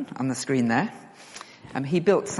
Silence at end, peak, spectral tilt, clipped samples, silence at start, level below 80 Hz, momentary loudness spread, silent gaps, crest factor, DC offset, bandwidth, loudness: 0 s; -8 dBFS; -5.5 dB/octave; under 0.1%; 0 s; -66 dBFS; 20 LU; none; 18 dB; under 0.1%; 11.5 kHz; -25 LUFS